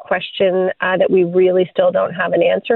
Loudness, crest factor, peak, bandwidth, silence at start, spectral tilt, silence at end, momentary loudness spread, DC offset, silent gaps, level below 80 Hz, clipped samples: -15 LUFS; 14 dB; -2 dBFS; 4.2 kHz; 0 s; -9.5 dB/octave; 0 s; 4 LU; under 0.1%; none; -62 dBFS; under 0.1%